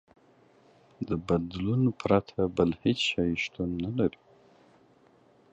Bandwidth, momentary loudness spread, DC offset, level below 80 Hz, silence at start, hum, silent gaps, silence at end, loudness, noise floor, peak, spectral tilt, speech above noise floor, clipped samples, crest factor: 8.4 kHz; 6 LU; under 0.1%; -52 dBFS; 1 s; none; none; 1.4 s; -29 LUFS; -61 dBFS; -10 dBFS; -6.5 dB/octave; 33 dB; under 0.1%; 20 dB